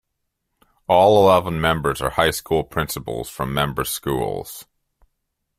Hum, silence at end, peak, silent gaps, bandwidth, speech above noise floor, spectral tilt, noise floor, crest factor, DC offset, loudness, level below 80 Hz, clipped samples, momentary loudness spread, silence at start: none; 0.95 s; -2 dBFS; none; 16 kHz; 57 dB; -4.5 dB/octave; -76 dBFS; 20 dB; under 0.1%; -19 LUFS; -44 dBFS; under 0.1%; 15 LU; 0.9 s